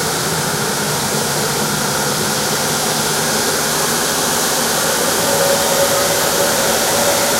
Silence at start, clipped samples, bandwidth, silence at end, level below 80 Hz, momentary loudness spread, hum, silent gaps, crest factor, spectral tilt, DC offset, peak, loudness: 0 s; under 0.1%; 16 kHz; 0 s; -46 dBFS; 3 LU; none; none; 14 dB; -2 dB/octave; under 0.1%; -2 dBFS; -15 LUFS